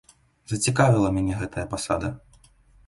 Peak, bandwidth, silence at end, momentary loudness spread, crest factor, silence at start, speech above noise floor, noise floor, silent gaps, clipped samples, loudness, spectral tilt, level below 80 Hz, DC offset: -6 dBFS; 11.5 kHz; 0.7 s; 13 LU; 20 dB; 0.5 s; 33 dB; -56 dBFS; none; under 0.1%; -24 LUFS; -5.5 dB/octave; -44 dBFS; under 0.1%